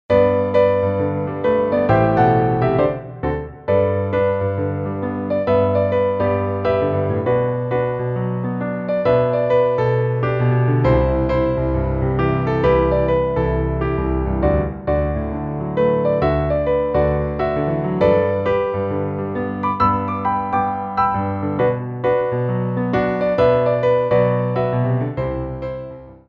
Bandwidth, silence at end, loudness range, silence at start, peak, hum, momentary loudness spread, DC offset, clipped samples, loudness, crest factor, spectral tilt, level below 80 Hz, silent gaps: 5.4 kHz; 0.15 s; 2 LU; 0.1 s; -2 dBFS; none; 7 LU; under 0.1%; under 0.1%; -19 LUFS; 16 dB; -10 dB/octave; -32 dBFS; none